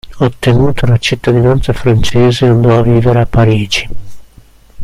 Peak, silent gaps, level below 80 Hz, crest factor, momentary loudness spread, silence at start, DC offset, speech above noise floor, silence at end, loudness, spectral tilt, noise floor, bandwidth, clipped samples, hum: 0 dBFS; none; -26 dBFS; 10 dB; 5 LU; 0.05 s; under 0.1%; 31 dB; 0 s; -10 LUFS; -6.5 dB/octave; -40 dBFS; 12 kHz; 0.1%; none